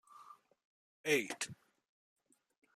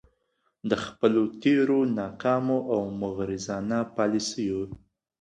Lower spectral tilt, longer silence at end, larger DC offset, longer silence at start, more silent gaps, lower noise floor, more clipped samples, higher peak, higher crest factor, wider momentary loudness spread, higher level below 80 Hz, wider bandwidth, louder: second, -2.5 dB/octave vs -5.5 dB/octave; first, 1.2 s vs 0.45 s; neither; second, 0.15 s vs 0.65 s; first, 0.65-1.04 s vs none; second, -61 dBFS vs -74 dBFS; neither; second, -20 dBFS vs -6 dBFS; about the same, 24 dB vs 20 dB; first, 24 LU vs 8 LU; second, -88 dBFS vs -58 dBFS; first, 14.5 kHz vs 11 kHz; second, -37 LUFS vs -27 LUFS